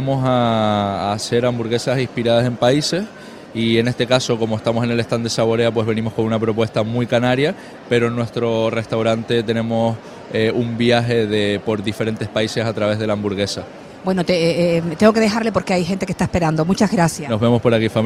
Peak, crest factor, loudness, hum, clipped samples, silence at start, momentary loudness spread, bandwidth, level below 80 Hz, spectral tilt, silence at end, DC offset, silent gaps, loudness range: 0 dBFS; 18 dB; -18 LUFS; none; under 0.1%; 0 s; 6 LU; 14 kHz; -48 dBFS; -6 dB/octave; 0 s; under 0.1%; none; 2 LU